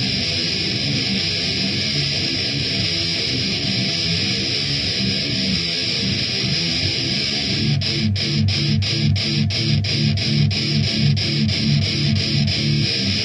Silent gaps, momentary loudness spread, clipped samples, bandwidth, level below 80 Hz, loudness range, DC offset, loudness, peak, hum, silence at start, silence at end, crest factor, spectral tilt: none; 1 LU; under 0.1%; 10.5 kHz; -44 dBFS; 1 LU; under 0.1%; -18 LUFS; -6 dBFS; none; 0 s; 0 s; 14 dB; -4.5 dB/octave